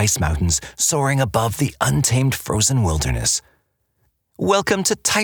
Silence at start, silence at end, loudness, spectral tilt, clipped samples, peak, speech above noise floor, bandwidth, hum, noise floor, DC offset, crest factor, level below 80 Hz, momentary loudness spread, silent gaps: 0 s; 0 s; -19 LUFS; -3.5 dB/octave; under 0.1%; -4 dBFS; 48 dB; over 20 kHz; none; -67 dBFS; under 0.1%; 16 dB; -34 dBFS; 3 LU; none